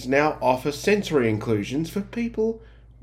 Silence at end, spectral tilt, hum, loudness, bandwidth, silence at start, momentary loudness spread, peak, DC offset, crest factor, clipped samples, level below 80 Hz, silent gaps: 0.35 s; -6 dB/octave; none; -24 LUFS; 15.5 kHz; 0 s; 7 LU; -4 dBFS; under 0.1%; 20 dB; under 0.1%; -48 dBFS; none